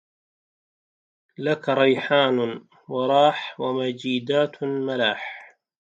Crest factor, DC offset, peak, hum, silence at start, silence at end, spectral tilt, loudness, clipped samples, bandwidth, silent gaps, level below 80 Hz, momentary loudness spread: 20 dB; under 0.1%; -4 dBFS; none; 1.4 s; 0.4 s; -6 dB/octave; -23 LUFS; under 0.1%; 7.8 kHz; none; -76 dBFS; 12 LU